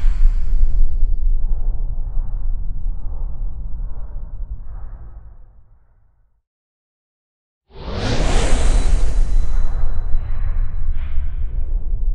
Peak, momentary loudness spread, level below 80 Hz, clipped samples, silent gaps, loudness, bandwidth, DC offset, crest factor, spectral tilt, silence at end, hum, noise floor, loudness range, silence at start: -2 dBFS; 14 LU; -18 dBFS; under 0.1%; 6.47-7.61 s; -25 LUFS; 9.6 kHz; under 0.1%; 14 dB; -5.5 dB/octave; 0 s; none; -55 dBFS; 16 LU; 0 s